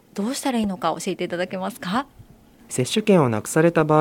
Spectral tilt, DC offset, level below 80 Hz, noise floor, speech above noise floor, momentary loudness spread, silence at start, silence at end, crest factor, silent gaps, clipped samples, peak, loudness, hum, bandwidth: -5.5 dB/octave; under 0.1%; -56 dBFS; -49 dBFS; 28 dB; 10 LU; 0.15 s; 0 s; 18 dB; none; under 0.1%; -2 dBFS; -22 LUFS; none; 17 kHz